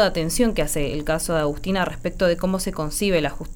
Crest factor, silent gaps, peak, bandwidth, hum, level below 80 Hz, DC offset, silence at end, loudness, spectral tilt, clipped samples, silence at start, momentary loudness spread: 16 dB; none; -6 dBFS; over 20 kHz; none; -32 dBFS; under 0.1%; 0 s; -23 LUFS; -4.5 dB/octave; under 0.1%; 0 s; 4 LU